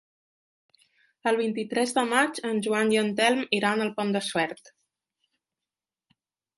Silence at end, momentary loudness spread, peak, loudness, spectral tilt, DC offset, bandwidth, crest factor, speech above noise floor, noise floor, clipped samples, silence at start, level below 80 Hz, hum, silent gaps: 1.9 s; 6 LU; -6 dBFS; -25 LUFS; -4 dB/octave; under 0.1%; 11.5 kHz; 22 dB; over 65 dB; under -90 dBFS; under 0.1%; 1.25 s; -76 dBFS; none; none